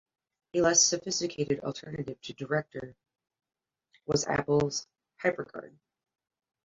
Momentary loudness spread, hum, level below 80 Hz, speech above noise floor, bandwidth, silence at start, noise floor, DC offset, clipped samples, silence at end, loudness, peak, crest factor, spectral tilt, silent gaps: 19 LU; none; -62 dBFS; 40 dB; 7.8 kHz; 0.55 s; -70 dBFS; under 0.1%; under 0.1%; 0.95 s; -29 LUFS; -10 dBFS; 22 dB; -3 dB/octave; none